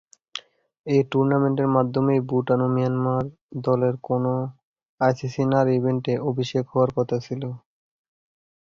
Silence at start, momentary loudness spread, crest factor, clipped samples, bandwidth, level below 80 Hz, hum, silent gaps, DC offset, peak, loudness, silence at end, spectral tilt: 0.35 s; 14 LU; 18 dB; under 0.1%; 7.4 kHz; -60 dBFS; none; 0.79-0.84 s, 3.41-3.49 s, 4.63-4.74 s, 4.83-4.98 s; under 0.1%; -6 dBFS; -23 LUFS; 1.1 s; -8 dB/octave